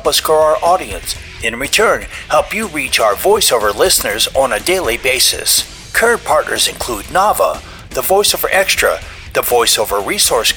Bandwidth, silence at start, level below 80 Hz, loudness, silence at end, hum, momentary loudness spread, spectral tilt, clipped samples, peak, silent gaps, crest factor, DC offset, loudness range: over 20 kHz; 0 s; -36 dBFS; -13 LUFS; 0 s; none; 8 LU; -1 dB/octave; under 0.1%; -2 dBFS; none; 12 dB; under 0.1%; 2 LU